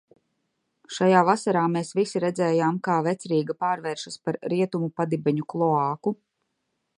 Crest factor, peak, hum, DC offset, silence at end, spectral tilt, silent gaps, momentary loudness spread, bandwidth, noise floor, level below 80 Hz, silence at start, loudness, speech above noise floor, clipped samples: 22 dB; -4 dBFS; none; under 0.1%; 0.85 s; -6.5 dB/octave; none; 11 LU; 11 kHz; -77 dBFS; -74 dBFS; 0.9 s; -24 LUFS; 53 dB; under 0.1%